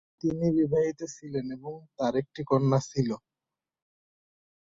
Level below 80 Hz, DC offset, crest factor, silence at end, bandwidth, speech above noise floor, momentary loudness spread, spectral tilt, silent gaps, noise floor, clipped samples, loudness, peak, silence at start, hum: -62 dBFS; under 0.1%; 18 dB; 1.6 s; 7.8 kHz; 62 dB; 14 LU; -7.5 dB/octave; none; -90 dBFS; under 0.1%; -28 LUFS; -12 dBFS; 0.25 s; none